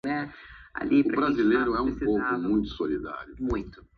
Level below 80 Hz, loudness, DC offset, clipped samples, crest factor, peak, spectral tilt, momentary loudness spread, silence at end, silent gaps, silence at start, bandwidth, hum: -46 dBFS; -27 LUFS; under 0.1%; under 0.1%; 16 dB; -12 dBFS; -8 dB/octave; 13 LU; 0.2 s; none; 0.05 s; 6.4 kHz; none